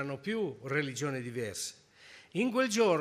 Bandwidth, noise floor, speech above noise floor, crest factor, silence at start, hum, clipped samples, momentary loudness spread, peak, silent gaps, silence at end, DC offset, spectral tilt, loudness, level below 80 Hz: 15.5 kHz; -57 dBFS; 24 dB; 16 dB; 0 s; none; under 0.1%; 12 LU; -16 dBFS; none; 0 s; under 0.1%; -4.5 dB/octave; -33 LUFS; -74 dBFS